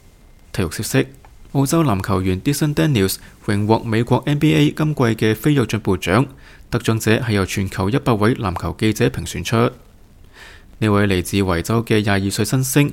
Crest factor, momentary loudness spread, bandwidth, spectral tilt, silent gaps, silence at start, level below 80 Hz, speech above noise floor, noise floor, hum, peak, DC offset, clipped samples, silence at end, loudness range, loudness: 18 dB; 6 LU; 17 kHz; -5.5 dB/octave; none; 0.55 s; -42 dBFS; 28 dB; -46 dBFS; none; 0 dBFS; under 0.1%; under 0.1%; 0 s; 3 LU; -18 LUFS